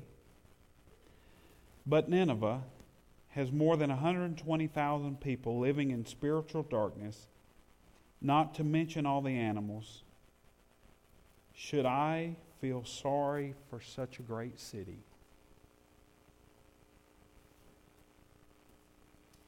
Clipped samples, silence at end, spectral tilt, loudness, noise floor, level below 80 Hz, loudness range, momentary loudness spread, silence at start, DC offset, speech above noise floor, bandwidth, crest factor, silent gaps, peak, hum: under 0.1%; 4.45 s; -7 dB/octave; -35 LUFS; -66 dBFS; -66 dBFS; 10 LU; 16 LU; 0 s; under 0.1%; 32 dB; 16 kHz; 18 dB; none; -18 dBFS; none